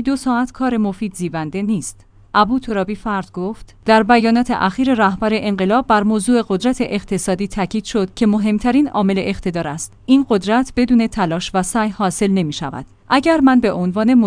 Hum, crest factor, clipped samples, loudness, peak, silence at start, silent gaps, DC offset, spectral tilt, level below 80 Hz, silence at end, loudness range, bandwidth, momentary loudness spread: none; 16 dB; under 0.1%; -17 LUFS; 0 dBFS; 0 s; none; under 0.1%; -5.5 dB/octave; -40 dBFS; 0 s; 3 LU; 10.5 kHz; 10 LU